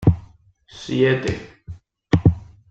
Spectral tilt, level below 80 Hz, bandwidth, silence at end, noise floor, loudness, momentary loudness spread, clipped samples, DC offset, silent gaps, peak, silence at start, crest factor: -7.5 dB/octave; -38 dBFS; 7.8 kHz; 0.3 s; -50 dBFS; -21 LUFS; 23 LU; under 0.1%; under 0.1%; none; -2 dBFS; 0 s; 18 dB